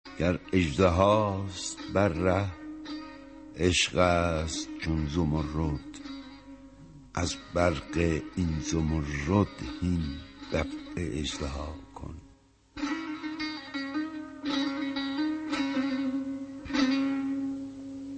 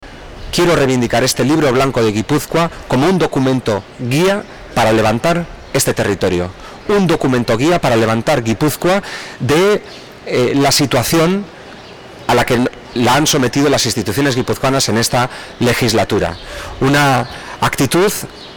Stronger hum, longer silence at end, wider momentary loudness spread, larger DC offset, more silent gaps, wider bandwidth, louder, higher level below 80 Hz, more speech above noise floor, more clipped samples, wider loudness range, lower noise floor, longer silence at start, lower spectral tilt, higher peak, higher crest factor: neither; about the same, 0 s vs 0 s; first, 17 LU vs 9 LU; neither; neither; second, 8.8 kHz vs over 20 kHz; second, -30 LUFS vs -14 LUFS; second, -46 dBFS vs -38 dBFS; first, 31 dB vs 20 dB; neither; first, 7 LU vs 1 LU; first, -59 dBFS vs -34 dBFS; about the same, 0.05 s vs 0 s; about the same, -5.5 dB/octave vs -4.5 dB/octave; about the same, -8 dBFS vs -6 dBFS; first, 22 dB vs 8 dB